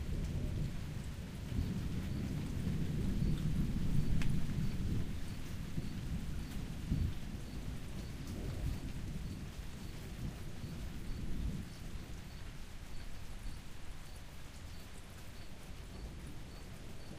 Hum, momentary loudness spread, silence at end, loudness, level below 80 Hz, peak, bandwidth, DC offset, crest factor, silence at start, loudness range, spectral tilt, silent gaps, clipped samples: none; 14 LU; 0 s; -43 LUFS; -44 dBFS; -20 dBFS; 15.5 kHz; under 0.1%; 18 dB; 0 s; 13 LU; -6.5 dB/octave; none; under 0.1%